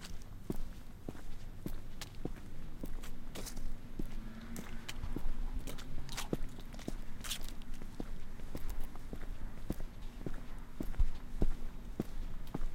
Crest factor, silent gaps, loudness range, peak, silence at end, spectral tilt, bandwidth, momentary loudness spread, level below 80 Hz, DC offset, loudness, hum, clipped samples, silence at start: 18 dB; none; 4 LU; -18 dBFS; 0 s; -5 dB/octave; 16 kHz; 9 LU; -40 dBFS; under 0.1%; -46 LUFS; none; under 0.1%; 0 s